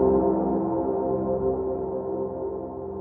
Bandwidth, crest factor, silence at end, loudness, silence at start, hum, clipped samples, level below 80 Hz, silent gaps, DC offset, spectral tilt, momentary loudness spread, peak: 2 kHz; 14 dB; 0 s; -26 LUFS; 0 s; none; under 0.1%; -46 dBFS; none; under 0.1%; -13.5 dB/octave; 9 LU; -10 dBFS